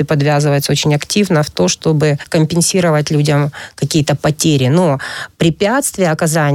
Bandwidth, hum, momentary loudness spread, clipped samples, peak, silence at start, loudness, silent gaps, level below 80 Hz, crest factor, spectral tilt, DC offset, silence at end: 16 kHz; none; 4 LU; under 0.1%; 0 dBFS; 0 s; -14 LUFS; none; -46 dBFS; 12 dB; -5 dB/octave; under 0.1%; 0 s